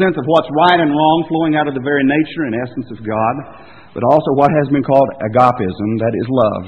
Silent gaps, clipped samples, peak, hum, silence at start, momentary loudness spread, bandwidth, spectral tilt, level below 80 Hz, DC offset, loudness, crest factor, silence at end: none; under 0.1%; 0 dBFS; none; 0 s; 8 LU; 7 kHz; -8.5 dB/octave; -50 dBFS; 0.2%; -14 LUFS; 14 dB; 0 s